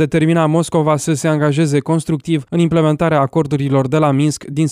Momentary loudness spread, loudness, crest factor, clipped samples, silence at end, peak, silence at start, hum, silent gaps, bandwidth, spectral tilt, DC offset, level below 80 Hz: 4 LU; -15 LUFS; 12 dB; under 0.1%; 0 s; -2 dBFS; 0 s; none; none; 13.5 kHz; -6.5 dB/octave; under 0.1%; -48 dBFS